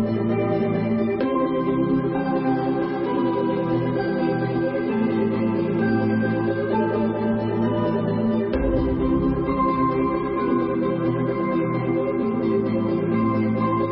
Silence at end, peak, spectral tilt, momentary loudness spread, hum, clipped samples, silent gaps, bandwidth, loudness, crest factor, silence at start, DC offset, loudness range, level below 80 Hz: 0 s; -10 dBFS; -12.5 dB/octave; 2 LU; none; under 0.1%; none; 5.6 kHz; -22 LUFS; 12 dB; 0 s; under 0.1%; 1 LU; -40 dBFS